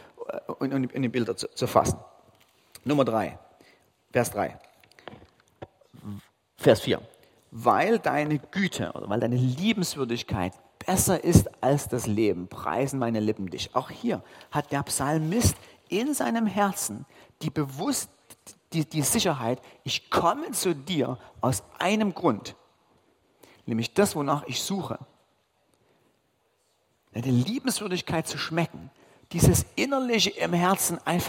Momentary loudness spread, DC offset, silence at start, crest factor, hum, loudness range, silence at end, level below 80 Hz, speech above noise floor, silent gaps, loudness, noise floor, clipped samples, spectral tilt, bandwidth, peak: 13 LU; under 0.1%; 0.2 s; 24 dB; none; 5 LU; 0 s; -50 dBFS; 44 dB; none; -27 LUFS; -70 dBFS; under 0.1%; -4.5 dB/octave; 16.5 kHz; -2 dBFS